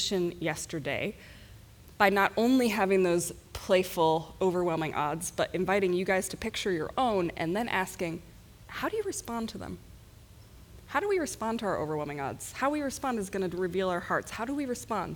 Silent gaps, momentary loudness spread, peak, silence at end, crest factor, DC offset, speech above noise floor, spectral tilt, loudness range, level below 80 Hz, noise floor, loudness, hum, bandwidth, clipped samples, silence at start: none; 11 LU; -8 dBFS; 0 s; 22 dB; under 0.1%; 23 dB; -4.5 dB/octave; 7 LU; -56 dBFS; -53 dBFS; -30 LUFS; none; over 20 kHz; under 0.1%; 0 s